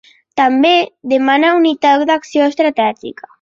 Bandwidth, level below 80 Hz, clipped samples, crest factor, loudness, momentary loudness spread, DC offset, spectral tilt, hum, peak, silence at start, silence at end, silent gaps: 7.6 kHz; -62 dBFS; under 0.1%; 12 dB; -13 LUFS; 7 LU; under 0.1%; -4 dB/octave; none; 0 dBFS; 0.35 s; 0.3 s; none